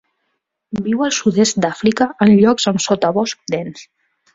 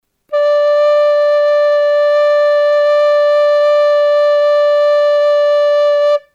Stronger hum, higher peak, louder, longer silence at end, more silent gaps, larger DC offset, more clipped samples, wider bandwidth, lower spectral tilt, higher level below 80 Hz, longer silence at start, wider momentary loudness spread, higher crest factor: neither; first, -2 dBFS vs -6 dBFS; second, -16 LUFS vs -11 LUFS; first, 0.5 s vs 0.15 s; neither; neither; neither; about the same, 7.8 kHz vs 7.4 kHz; first, -4.5 dB/octave vs 1.5 dB/octave; first, -54 dBFS vs -74 dBFS; first, 0.7 s vs 0.3 s; first, 12 LU vs 1 LU; first, 16 dB vs 6 dB